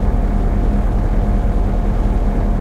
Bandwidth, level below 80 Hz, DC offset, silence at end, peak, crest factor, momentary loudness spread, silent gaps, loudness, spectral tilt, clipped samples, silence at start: 4.1 kHz; -16 dBFS; under 0.1%; 0 s; -4 dBFS; 10 dB; 1 LU; none; -19 LUFS; -9 dB/octave; under 0.1%; 0 s